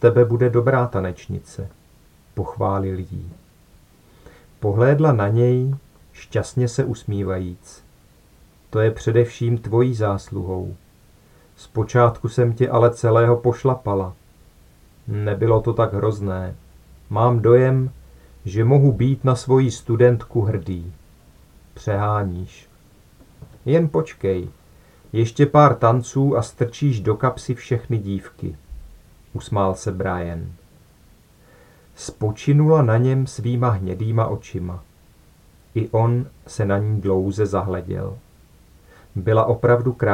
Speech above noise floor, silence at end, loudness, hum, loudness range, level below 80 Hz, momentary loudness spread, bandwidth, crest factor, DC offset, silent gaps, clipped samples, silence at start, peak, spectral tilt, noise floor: 33 dB; 0 s; -20 LUFS; none; 7 LU; -48 dBFS; 17 LU; 10.5 kHz; 20 dB; under 0.1%; none; under 0.1%; 0 s; 0 dBFS; -8 dB/octave; -52 dBFS